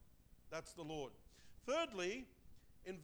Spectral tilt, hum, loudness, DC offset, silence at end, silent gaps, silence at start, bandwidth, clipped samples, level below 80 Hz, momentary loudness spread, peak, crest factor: -4 dB/octave; none; -46 LUFS; under 0.1%; 0 s; none; 0 s; over 20 kHz; under 0.1%; -68 dBFS; 16 LU; -30 dBFS; 18 dB